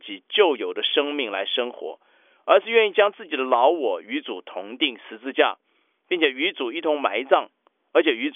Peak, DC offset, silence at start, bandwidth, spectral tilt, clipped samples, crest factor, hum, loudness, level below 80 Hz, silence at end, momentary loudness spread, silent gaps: -4 dBFS; under 0.1%; 0.05 s; 3.8 kHz; -5 dB/octave; under 0.1%; 20 dB; none; -22 LUFS; -88 dBFS; 0.05 s; 14 LU; none